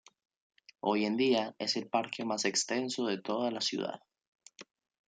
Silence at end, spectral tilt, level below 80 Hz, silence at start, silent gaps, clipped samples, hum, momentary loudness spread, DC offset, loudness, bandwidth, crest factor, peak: 0.45 s; -3 dB/octave; -82 dBFS; 0.85 s; 4.27-4.39 s; under 0.1%; none; 7 LU; under 0.1%; -32 LUFS; 9.6 kHz; 20 dB; -14 dBFS